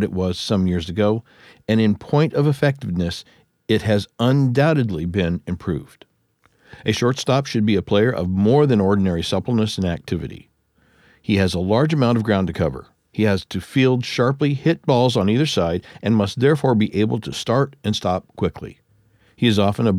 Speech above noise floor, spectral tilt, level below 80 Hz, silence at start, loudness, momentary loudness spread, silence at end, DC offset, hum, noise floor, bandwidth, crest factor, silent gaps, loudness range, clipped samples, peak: 43 dB; -6.5 dB/octave; -46 dBFS; 0 s; -20 LUFS; 9 LU; 0 s; under 0.1%; none; -62 dBFS; 13.5 kHz; 16 dB; none; 3 LU; under 0.1%; -4 dBFS